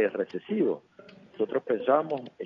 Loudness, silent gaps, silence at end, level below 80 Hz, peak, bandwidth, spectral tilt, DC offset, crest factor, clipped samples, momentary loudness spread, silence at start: -29 LUFS; none; 0 s; -80 dBFS; -10 dBFS; 5.8 kHz; -8.5 dB/octave; under 0.1%; 20 dB; under 0.1%; 9 LU; 0 s